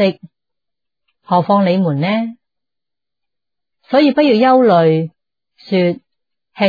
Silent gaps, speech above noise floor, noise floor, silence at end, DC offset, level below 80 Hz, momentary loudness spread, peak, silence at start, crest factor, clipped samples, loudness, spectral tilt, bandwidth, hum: none; 74 dB; -86 dBFS; 0 s; under 0.1%; -66 dBFS; 13 LU; -2 dBFS; 0 s; 14 dB; under 0.1%; -14 LUFS; -9 dB/octave; 5 kHz; none